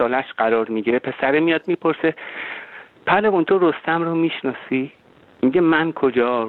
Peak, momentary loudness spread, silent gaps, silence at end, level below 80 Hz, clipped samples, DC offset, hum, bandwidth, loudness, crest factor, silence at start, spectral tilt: -4 dBFS; 13 LU; none; 0 s; -60 dBFS; under 0.1%; under 0.1%; none; 4.3 kHz; -20 LUFS; 16 dB; 0 s; -9 dB/octave